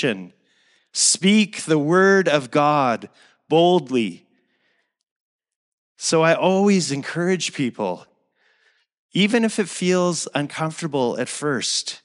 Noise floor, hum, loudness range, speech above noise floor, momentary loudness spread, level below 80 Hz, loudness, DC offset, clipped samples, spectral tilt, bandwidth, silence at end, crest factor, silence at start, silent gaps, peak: -68 dBFS; none; 5 LU; 48 dB; 10 LU; -80 dBFS; -20 LUFS; under 0.1%; under 0.1%; -4 dB/octave; 11.5 kHz; 0.1 s; 18 dB; 0 s; 5.11-5.39 s, 5.56-5.95 s, 8.98-9.09 s; -4 dBFS